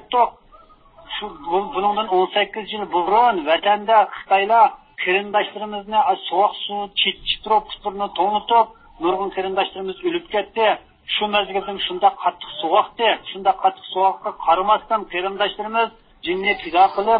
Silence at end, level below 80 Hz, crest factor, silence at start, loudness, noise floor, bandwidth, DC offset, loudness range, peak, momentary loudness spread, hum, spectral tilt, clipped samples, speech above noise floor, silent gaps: 0 s; -54 dBFS; 18 dB; 0.1 s; -20 LUFS; -49 dBFS; 5.2 kHz; under 0.1%; 4 LU; -2 dBFS; 9 LU; none; -8.5 dB/octave; under 0.1%; 29 dB; none